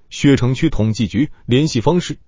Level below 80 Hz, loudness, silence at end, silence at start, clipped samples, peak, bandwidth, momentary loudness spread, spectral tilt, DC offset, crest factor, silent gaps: -34 dBFS; -16 LUFS; 0.1 s; 0.1 s; under 0.1%; -2 dBFS; 7.6 kHz; 4 LU; -6.5 dB/octave; under 0.1%; 14 dB; none